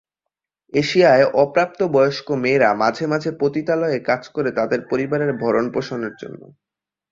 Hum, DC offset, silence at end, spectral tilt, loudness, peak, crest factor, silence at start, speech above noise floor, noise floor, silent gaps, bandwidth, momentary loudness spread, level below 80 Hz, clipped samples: none; under 0.1%; 0.75 s; -6 dB/octave; -19 LUFS; -2 dBFS; 18 dB; 0.75 s; 65 dB; -83 dBFS; none; 7.6 kHz; 9 LU; -60 dBFS; under 0.1%